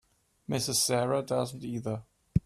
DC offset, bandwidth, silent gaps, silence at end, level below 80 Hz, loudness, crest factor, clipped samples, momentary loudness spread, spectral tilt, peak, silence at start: under 0.1%; 15.5 kHz; none; 0.05 s; -52 dBFS; -30 LUFS; 20 dB; under 0.1%; 12 LU; -4 dB/octave; -12 dBFS; 0.5 s